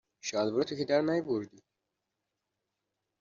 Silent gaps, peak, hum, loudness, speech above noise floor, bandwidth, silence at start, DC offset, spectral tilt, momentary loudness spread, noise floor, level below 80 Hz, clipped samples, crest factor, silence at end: none; -16 dBFS; none; -31 LUFS; 55 dB; 7.6 kHz; 0.25 s; under 0.1%; -4.5 dB/octave; 7 LU; -86 dBFS; -76 dBFS; under 0.1%; 18 dB; 1.7 s